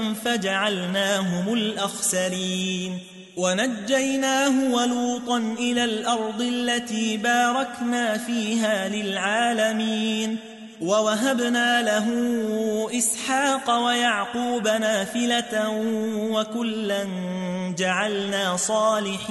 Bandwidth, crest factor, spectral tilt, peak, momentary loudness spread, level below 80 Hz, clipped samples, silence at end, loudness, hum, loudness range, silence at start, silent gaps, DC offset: 12 kHz; 14 dB; -3 dB/octave; -8 dBFS; 6 LU; -68 dBFS; under 0.1%; 0 s; -23 LUFS; none; 2 LU; 0 s; none; under 0.1%